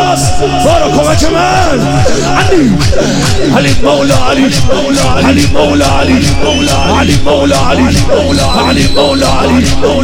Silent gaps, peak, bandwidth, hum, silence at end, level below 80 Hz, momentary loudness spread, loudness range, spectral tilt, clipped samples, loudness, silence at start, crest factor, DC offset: none; 0 dBFS; 16.5 kHz; none; 0 s; -20 dBFS; 2 LU; 0 LU; -5 dB/octave; 0.2%; -8 LUFS; 0 s; 8 dB; 3%